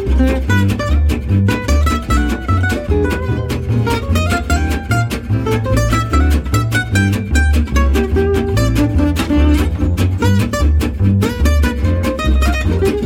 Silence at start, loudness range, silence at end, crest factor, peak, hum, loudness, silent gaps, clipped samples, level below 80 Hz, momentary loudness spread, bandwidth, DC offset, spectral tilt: 0 s; 2 LU; 0 s; 12 dB; -2 dBFS; none; -15 LUFS; none; under 0.1%; -18 dBFS; 3 LU; 16.5 kHz; under 0.1%; -6.5 dB/octave